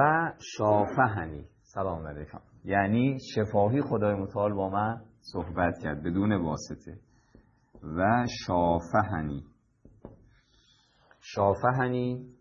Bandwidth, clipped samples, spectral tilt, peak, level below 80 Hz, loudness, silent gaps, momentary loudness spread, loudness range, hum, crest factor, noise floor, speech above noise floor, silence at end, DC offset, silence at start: 7.6 kHz; under 0.1%; -7 dB/octave; -8 dBFS; -54 dBFS; -28 LUFS; none; 15 LU; 3 LU; none; 20 dB; -64 dBFS; 36 dB; 0.1 s; under 0.1%; 0 s